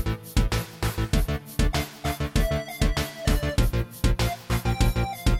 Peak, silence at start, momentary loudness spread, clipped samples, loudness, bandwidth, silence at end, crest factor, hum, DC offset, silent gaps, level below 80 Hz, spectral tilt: -8 dBFS; 0 s; 4 LU; under 0.1%; -27 LUFS; 16.5 kHz; 0 s; 16 dB; none; under 0.1%; none; -28 dBFS; -5 dB/octave